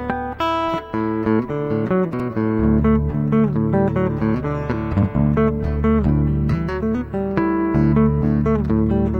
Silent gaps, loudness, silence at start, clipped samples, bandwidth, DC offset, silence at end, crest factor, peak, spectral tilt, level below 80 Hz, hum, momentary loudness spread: none; -19 LUFS; 0 s; under 0.1%; 6 kHz; under 0.1%; 0 s; 14 dB; -4 dBFS; -10 dB/octave; -30 dBFS; none; 6 LU